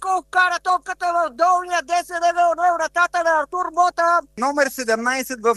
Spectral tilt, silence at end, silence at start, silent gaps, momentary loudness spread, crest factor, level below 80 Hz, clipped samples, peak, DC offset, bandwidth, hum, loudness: -1.5 dB/octave; 0 s; 0 s; none; 4 LU; 16 dB; -58 dBFS; under 0.1%; -4 dBFS; under 0.1%; 12.5 kHz; none; -19 LUFS